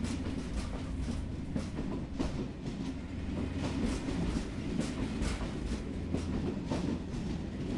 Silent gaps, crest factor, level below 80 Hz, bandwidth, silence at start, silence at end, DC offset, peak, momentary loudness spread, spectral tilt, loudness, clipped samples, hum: none; 16 dB; -42 dBFS; 11.5 kHz; 0 s; 0 s; under 0.1%; -20 dBFS; 4 LU; -6.5 dB/octave; -37 LUFS; under 0.1%; none